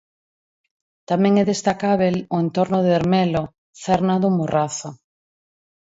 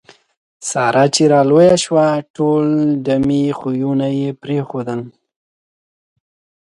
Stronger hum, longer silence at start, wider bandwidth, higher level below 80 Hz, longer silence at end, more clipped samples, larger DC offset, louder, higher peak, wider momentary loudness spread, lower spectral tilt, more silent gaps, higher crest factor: neither; first, 1.1 s vs 0.6 s; second, 8 kHz vs 11.5 kHz; about the same, -54 dBFS vs -52 dBFS; second, 1 s vs 1.55 s; neither; neither; second, -20 LUFS vs -15 LUFS; second, -6 dBFS vs 0 dBFS; second, 8 LU vs 12 LU; about the same, -6.5 dB/octave vs -5.5 dB/octave; first, 3.58-3.73 s vs 2.30-2.34 s; about the same, 16 dB vs 16 dB